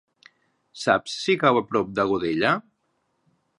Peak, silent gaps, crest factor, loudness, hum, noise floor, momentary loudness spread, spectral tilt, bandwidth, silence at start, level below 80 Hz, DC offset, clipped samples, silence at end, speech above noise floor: -4 dBFS; none; 22 dB; -23 LUFS; none; -72 dBFS; 6 LU; -5 dB/octave; 11 kHz; 0.75 s; -60 dBFS; under 0.1%; under 0.1%; 1 s; 50 dB